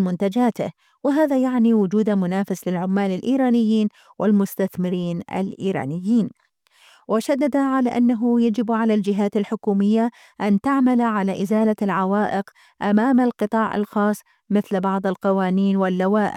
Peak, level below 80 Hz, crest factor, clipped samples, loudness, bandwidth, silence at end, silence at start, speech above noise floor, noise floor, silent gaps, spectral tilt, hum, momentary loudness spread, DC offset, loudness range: -6 dBFS; -66 dBFS; 14 dB; under 0.1%; -21 LUFS; 15.5 kHz; 0 s; 0 s; 35 dB; -55 dBFS; none; -7.5 dB/octave; none; 7 LU; under 0.1%; 3 LU